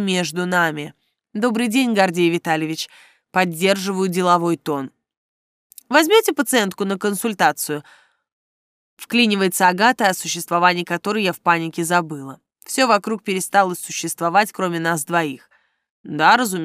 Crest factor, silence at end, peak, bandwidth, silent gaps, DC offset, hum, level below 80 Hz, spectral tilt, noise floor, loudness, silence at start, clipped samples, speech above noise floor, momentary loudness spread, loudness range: 18 dB; 0 s; -2 dBFS; 16 kHz; 5.17-5.70 s, 8.32-8.97 s, 15.90-16.04 s; under 0.1%; none; -74 dBFS; -4 dB/octave; under -90 dBFS; -19 LUFS; 0 s; under 0.1%; over 71 dB; 11 LU; 3 LU